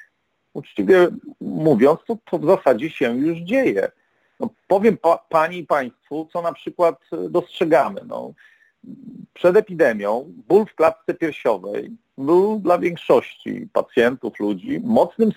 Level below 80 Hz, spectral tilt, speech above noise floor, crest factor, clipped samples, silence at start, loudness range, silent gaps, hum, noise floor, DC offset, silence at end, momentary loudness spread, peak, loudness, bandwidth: -64 dBFS; -7 dB/octave; 47 dB; 16 dB; under 0.1%; 0.55 s; 3 LU; none; none; -66 dBFS; under 0.1%; 0.05 s; 14 LU; -4 dBFS; -19 LUFS; 17 kHz